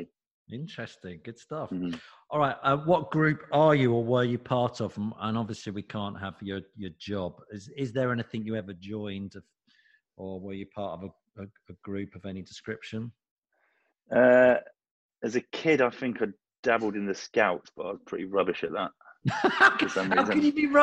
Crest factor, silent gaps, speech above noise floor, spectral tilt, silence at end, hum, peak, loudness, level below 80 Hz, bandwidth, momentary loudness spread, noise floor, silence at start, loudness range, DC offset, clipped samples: 22 dB; 0.27-0.46 s, 13.31-13.42 s, 14.91-15.09 s, 16.59-16.63 s; 45 dB; -6.5 dB/octave; 0 s; none; -6 dBFS; -27 LUFS; -66 dBFS; 9.2 kHz; 19 LU; -73 dBFS; 0 s; 14 LU; under 0.1%; under 0.1%